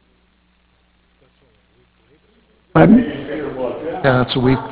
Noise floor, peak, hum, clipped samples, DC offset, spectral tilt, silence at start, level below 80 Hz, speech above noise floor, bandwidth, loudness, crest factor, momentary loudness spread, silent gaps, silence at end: -58 dBFS; 0 dBFS; none; under 0.1%; under 0.1%; -11 dB/octave; 2.75 s; -42 dBFS; 42 dB; 4 kHz; -16 LUFS; 18 dB; 14 LU; none; 0 s